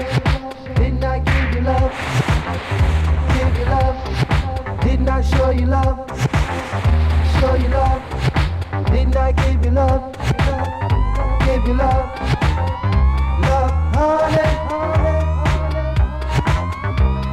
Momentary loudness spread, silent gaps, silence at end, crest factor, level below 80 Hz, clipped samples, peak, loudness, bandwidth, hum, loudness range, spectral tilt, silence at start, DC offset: 4 LU; none; 0 s; 12 dB; -20 dBFS; under 0.1%; -4 dBFS; -18 LUFS; 10.5 kHz; none; 1 LU; -7 dB/octave; 0 s; under 0.1%